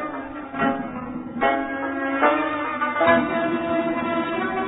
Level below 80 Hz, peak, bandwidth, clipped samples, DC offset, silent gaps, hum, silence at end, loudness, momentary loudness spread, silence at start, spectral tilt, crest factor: -54 dBFS; -6 dBFS; 4 kHz; under 0.1%; under 0.1%; none; none; 0 s; -23 LUFS; 12 LU; 0 s; -9.5 dB/octave; 18 dB